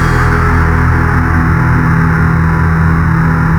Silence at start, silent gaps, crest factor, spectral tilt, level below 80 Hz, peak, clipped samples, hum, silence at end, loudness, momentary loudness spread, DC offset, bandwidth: 0 s; none; 10 dB; -8 dB/octave; -18 dBFS; 0 dBFS; under 0.1%; none; 0 s; -10 LUFS; 1 LU; under 0.1%; 10.5 kHz